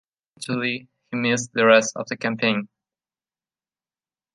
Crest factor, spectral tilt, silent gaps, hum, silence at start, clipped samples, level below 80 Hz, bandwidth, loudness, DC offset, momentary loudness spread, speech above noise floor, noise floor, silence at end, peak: 22 dB; -4 dB/octave; none; none; 0.4 s; under 0.1%; -72 dBFS; 11.5 kHz; -21 LUFS; under 0.1%; 16 LU; over 69 dB; under -90 dBFS; 1.7 s; -2 dBFS